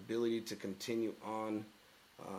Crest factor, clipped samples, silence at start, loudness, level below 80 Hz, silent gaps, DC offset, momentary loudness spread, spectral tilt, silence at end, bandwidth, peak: 16 dB; under 0.1%; 0 s; -40 LUFS; -82 dBFS; none; under 0.1%; 17 LU; -5 dB/octave; 0 s; 16 kHz; -26 dBFS